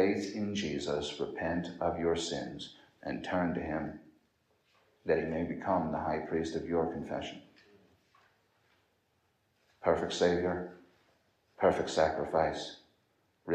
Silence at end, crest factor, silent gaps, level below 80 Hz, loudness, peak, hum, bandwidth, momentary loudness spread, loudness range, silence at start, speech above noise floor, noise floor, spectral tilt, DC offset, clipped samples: 0 s; 22 dB; none; -62 dBFS; -33 LUFS; -14 dBFS; none; 9.8 kHz; 14 LU; 6 LU; 0 s; 42 dB; -75 dBFS; -5.5 dB/octave; under 0.1%; under 0.1%